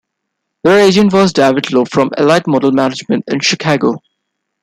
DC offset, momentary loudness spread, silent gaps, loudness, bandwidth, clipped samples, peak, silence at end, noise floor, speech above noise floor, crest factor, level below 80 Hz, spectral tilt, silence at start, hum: under 0.1%; 8 LU; none; -12 LUFS; 13.5 kHz; under 0.1%; 0 dBFS; 0.65 s; -73 dBFS; 62 dB; 12 dB; -52 dBFS; -5 dB/octave; 0.65 s; none